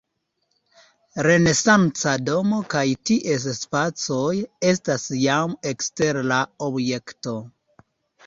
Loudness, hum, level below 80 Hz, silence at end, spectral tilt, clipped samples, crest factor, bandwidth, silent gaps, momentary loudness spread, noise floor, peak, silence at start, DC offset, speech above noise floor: -21 LUFS; none; -58 dBFS; 0.8 s; -4.5 dB/octave; under 0.1%; 20 dB; 7.8 kHz; none; 10 LU; -73 dBFS; -2 dBFS; 1.15 s; under 0.1%; 52 dB